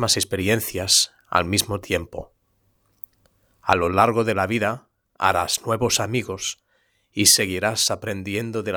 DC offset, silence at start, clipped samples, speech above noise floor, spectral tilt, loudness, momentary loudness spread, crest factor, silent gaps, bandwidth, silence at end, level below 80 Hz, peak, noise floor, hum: under 0.1%; 0 s; under 0.1%; 45 dB; -2.5 dB/octave; -21 LUFS; 18 LU; 22 dB; none; over 20 kHz; 0 s; -52 dBFS; 0 dBFS; -66 dBFS; none